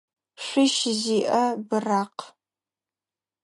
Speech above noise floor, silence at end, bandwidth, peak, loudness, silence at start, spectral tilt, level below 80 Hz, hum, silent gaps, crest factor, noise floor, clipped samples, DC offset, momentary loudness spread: over 67 dB; 1.15 s; 11.5 kHz; -10 dBFS; -24 LUFS; 0.4 s; -3.5 dB/octave; -80 dBFS; none; none; 16 dB; under -90 dBFS; under 0.1%; under 0.1%; 13 LU